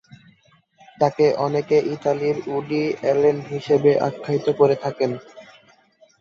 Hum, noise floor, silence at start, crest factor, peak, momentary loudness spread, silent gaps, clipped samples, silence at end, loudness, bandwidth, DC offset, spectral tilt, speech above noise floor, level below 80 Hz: none; -58 dBFS; 1 s; 18 dB; -4 dBFS; 7 LU; none; under 0.1%; 0.8 s; -21 LUFS; 7.2 kHz; under 0.1%; -7 dB/octave; 38 dB; -64 dBFS